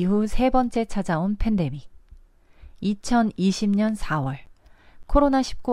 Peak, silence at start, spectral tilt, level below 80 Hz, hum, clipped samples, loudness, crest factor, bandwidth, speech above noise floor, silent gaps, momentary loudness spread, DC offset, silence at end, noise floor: -6 dBFS; 0 s; -6.5 dB/octave; -34 dBFS; none; under 0.1%; -23 LUFS; 18 dB; 12 kHz; 29 dB; none; 9 LU; under 0.1%; 0 s; -50 dBFS